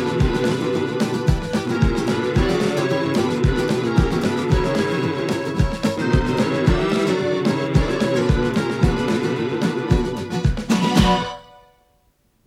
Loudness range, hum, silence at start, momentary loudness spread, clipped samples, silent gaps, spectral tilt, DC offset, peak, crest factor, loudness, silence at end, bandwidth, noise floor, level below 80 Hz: 1 LU; none; 0 s; 4 LU; under 0.1%; none; -6.5 dB/octave; under 0.1%; -2 dBFS; 18 dB; -20 LUFS; 1.05 s; 15.5 kHz; -61 dBFS; -28 dBFS